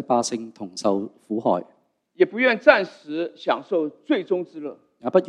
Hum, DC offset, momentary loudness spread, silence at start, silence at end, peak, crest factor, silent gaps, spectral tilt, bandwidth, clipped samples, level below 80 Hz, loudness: none; under 0.1%; 15 LU; 0 s; 0 s; 0 dBFS; 22 dB; none; -4.5 dB/octave; 11 kHz; under 0.1%; -68 dBFS; -23 LUFS